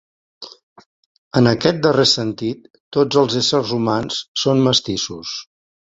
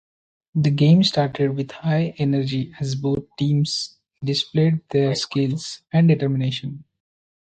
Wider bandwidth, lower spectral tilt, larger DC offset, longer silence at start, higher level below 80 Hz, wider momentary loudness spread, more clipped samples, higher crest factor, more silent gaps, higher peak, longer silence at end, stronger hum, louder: second, 8 kHz vs 9 kHz; second, -4.5 dB/octave vs -6.5 dB/octave; neither; second, 0.4 s vs 0.55 s; about the same, -52 dBFS vs -56 dBFS; first, 17 LU vs 11 LU; neither; about the same, 18 dB vs 16 dB; first, 0.63-0.76 s, 0.86-1.31 s, 2.80-2.91 s, 4.28-4.35 s vs none; first, 0 dBFS vs -6 dBFS; second, 0.5 s vs 0.7 s; neither; first, -17 LUFS vs -21 LUFS